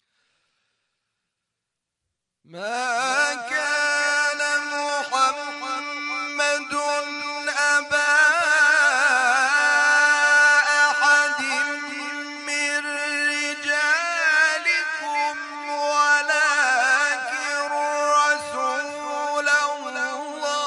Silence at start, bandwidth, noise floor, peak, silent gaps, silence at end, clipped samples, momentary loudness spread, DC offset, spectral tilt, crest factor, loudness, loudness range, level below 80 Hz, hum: 2.5 s; 11 kHz; -83 dBFS; -6 dBFS; none; 0 s; under 0.1%; 11 LU; under 0.1%; 0.5 dB/octave; 16 dB; -20 LUFS; 7 LU; -78 dBFS; none